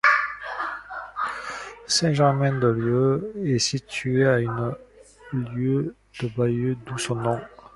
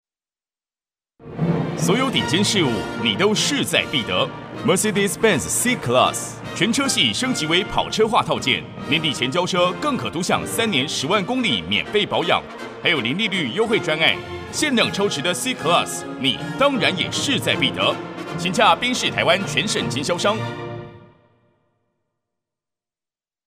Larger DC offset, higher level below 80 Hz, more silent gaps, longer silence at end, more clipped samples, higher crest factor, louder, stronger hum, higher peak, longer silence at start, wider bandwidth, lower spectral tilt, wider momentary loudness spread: neither; about the same, -54 dBFS vs -52 dBFS; neither; second, 0.1 s vs 2.4 s; neither; about the same, 20 dB vs 20 dB; second, -24 LUFS vs -19 LUFS; neither; about the same, -4 dBFS vs -2 dBFS; second, 0.05 s vs 1.2 s; second, 11.5 kHz vs 15.5 kHz; first, -5 dB/octave vs -3.5 dB/octave; first, 12 LU vs 6 LU